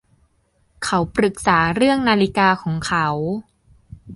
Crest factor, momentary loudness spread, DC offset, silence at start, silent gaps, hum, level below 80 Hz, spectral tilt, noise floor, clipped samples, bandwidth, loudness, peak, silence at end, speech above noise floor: 18 dB; 9 LU; under 0.1%; 0.8 s; none; none; -46 dBFS; -5 dB/octave; -62 dBFS; under 0.1%; 11.5 kHz; -18 LUFS; -2 dBFS; 0 s; 44 dB